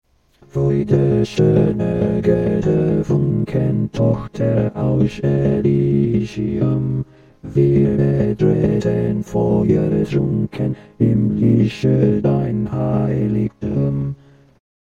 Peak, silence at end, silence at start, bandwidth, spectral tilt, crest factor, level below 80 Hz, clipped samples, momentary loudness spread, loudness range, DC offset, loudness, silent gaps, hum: -2 dBFS; 0.85 s; 0.55 s; 7.4 kHz; -9.5 dB/octave; 16 dB; -40 dBFS; under 0.1%; 6 LU; 1 LU; under 0.1%; -18 LUFS; none; none